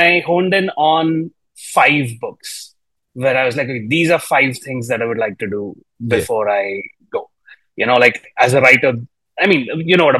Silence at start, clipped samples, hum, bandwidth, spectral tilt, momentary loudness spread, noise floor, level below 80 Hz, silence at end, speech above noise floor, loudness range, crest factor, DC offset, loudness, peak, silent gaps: 0 s; under 0.1%; none; 13.5 kHz; -5 dB/octave; 16 LU; -54 dBFS; -58 dBFS; 0 s; 39 dB; 4 LU; 16 dB; under 0.1%; -15 LUFS; 0 dBFS; none